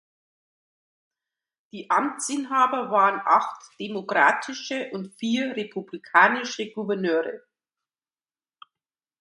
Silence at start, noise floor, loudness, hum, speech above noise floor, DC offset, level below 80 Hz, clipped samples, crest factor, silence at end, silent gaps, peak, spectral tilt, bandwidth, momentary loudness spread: 1.75 s; under -90 dBFS; -24 LUFS; none; over 66 dB; under 0.1%; -78 dBFS; under 0.1%; 24 dB; 1.85 s; none; -2 dBFS; -3.5 dB/octave; 11.5 kHz; 15 LU